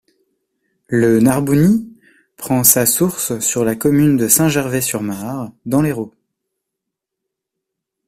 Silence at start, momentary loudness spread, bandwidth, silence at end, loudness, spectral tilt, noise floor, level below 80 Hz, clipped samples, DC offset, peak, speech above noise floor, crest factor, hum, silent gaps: 0.9 s; 13 LU; 16 kHz; 2 s; -15 LUFS; -5 dB/octave; -80 dBFS; -48 dBFS; under 0.1%; under 0.1%; 0 dBFS; 65 dB; 18 dB; none; none